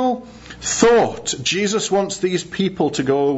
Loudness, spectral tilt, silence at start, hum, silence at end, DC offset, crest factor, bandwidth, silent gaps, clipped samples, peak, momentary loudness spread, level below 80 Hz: -19 LUFS; -3.5 dB/octave; 0 s; none; 0 s; under 0.1%; 18 dB; 8 kHz; none; under 0.1%; -2 dBFS; 9 LU; -48 dBFS